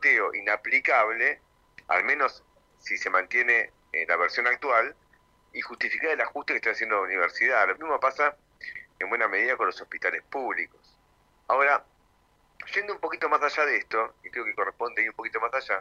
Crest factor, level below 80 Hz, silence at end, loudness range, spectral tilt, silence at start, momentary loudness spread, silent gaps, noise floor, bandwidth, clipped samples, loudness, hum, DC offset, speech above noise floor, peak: 20 dB; -68 dBFS; 0 s; 4 LU; -2.5 dB/octave; 0 s; 10 LU; none; -64 dBFS; 11 kHz; under 0.1%; -25 LUFS; none; under 0.1%; 38 dB; -8 dBFS